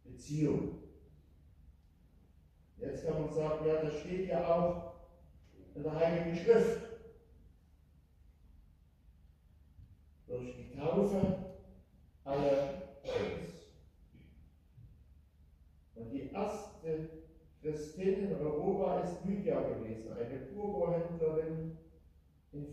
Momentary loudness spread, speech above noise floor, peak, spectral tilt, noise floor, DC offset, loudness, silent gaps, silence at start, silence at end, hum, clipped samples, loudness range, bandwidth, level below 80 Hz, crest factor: 18 LU; 30 dB; -14 dBFS; -7.5 dB/octave; -64 dBFS; under 0.1%; -36 LUFS; none; 0.05 s; 0 s; none; under 0.1%; 11 LU; 12.5 kHz; -60 dBFS; 24 dB